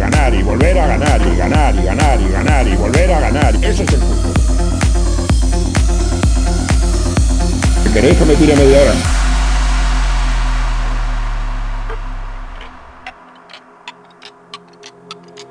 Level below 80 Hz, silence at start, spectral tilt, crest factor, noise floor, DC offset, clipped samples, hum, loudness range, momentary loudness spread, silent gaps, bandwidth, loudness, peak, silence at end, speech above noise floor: -14 dBFS; 0 s; -5.5 dB/octave; 12 dB; -40 dBFS; under 0.1%; under 0.1%; none; 16 LU; 23 LU; none; 10.5 kHz; -14 LUFS; 0 dBFS; 0.05 s; 31 dB